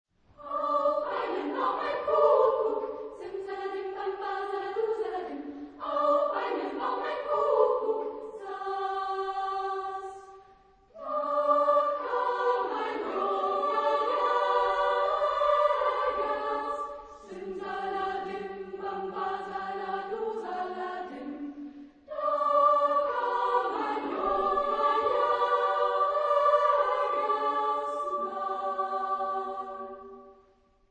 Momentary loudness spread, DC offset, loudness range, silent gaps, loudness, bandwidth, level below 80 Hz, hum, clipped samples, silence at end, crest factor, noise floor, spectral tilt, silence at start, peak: 14 LU; under 0.1%; 8 LU; none; -29 LUFS; 8.8 kHz; -64 dBFS; none; under 0.1%; 0.55 s; 18 dB; -64 dBFS; -4.5 dB/octave; 0.4 s; -10 dBFS